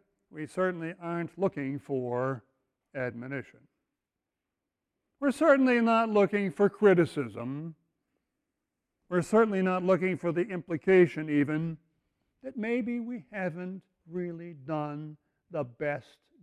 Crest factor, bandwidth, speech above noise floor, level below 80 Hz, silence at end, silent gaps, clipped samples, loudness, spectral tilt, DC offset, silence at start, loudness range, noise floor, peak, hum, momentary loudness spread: 20 dB; 11.5 kHz; 59 dB; -72 dBFS; 0.4 s; none; under 0.1%; -29 LUFS; -7.5 dB/octave; under 0.1%; 0.35 s; 11 LU; -88 dBFS; -10 dBFS; none; 18 LU